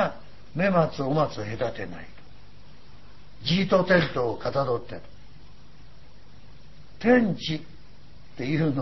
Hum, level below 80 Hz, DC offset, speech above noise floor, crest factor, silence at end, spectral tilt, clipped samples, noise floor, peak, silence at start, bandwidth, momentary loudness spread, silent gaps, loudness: 50 Hz at -55 dBFS; -52 dBFS; 1%; 27 dB; 20 dB; 0 s; -7 dB/octave; under 0.1%; -51 dBFS; -6 dBFS; 0 s; 6.2 kHz; 17 LU; none; -25 LUFS